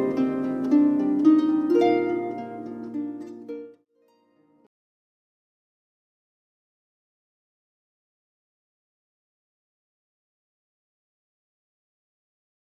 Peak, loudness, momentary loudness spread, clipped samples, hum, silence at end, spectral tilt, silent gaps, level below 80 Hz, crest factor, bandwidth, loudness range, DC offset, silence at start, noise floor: -8 dBFS; -23 LUFS; 19 LU; under 0.1%; none; 9 s; -7.5 dB/octave; none; -74 dBFS; 20 dB; 6.4 kHz; 21 LU; under 0.1%; 0 s; -65 dBFS